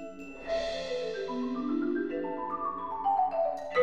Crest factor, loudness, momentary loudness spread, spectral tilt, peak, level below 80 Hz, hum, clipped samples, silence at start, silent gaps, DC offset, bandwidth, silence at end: 18 dB; -32 LUFS; 6 LU; -5 dB/octave; -14 dBFS; -60 dBFS; none; under 0.1%; 0 s; none; 0.3%; 9.4 kHz; 0 s